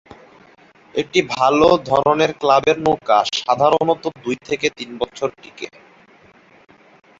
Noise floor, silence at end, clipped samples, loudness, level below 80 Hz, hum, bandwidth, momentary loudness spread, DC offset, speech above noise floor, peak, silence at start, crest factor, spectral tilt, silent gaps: -50 dBFS; 1.5 s; under 0.1%; -17 LUFS; -54 dBFS; none; 7.8 kHz; 12 LU; under 0.1%; 32 dB; -2 dBFS; 0.95 s; 18 dB; -4.5 dB/octave; none